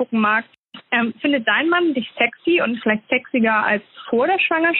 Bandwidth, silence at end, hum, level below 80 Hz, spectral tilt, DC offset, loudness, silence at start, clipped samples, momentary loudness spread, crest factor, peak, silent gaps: 4.2 kHz; 0 s; none; -68 dBFS; -2 dB/octave; under 0.1%; -19 LUFS; 0 s; under 0.1%; 5 LU; 16 dB; -2 dBFS; 0.57-0.69 s